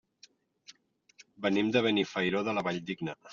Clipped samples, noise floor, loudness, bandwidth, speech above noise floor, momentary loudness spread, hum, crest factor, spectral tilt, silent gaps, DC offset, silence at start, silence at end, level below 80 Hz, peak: under 0.1%; -63 dBFS; -30 LUFS; 7.4 kHz; 33 dB; 9 LU; none; 20 dB; -3.5 dB/octave; none; under 0.1%; 0.7 s; 0 s; -70 dBFS; -12 dBFS